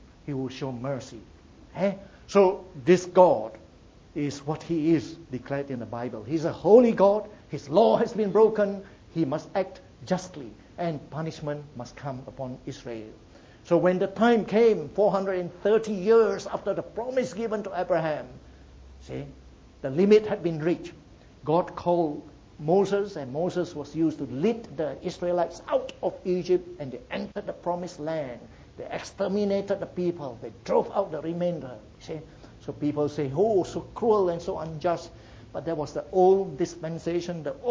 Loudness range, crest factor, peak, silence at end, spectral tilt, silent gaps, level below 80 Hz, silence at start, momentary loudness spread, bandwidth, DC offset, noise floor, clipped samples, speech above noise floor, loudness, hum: 8 LU; 24 dB; -4 dBFS; 0 s; -7 dB/octave; none; -56 dBFS; 0.25 s; 18 LU; 8 kHz; under 0.1%; -52 dBFS; under 0.1%; 27 dB; -26 LUFS; none